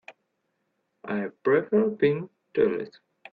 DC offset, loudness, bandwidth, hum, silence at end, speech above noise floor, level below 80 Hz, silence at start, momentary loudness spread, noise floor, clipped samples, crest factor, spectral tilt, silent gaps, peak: under 0.1%; -26 LUFS; 4.9 kHz; none; 0.45 s; 52 dB; -68 dBFS; 0.1 s; 11 LU; -76 dBFS; under 0.1%; 16 dB; -9.5 dB/octave; none; -10 dBFS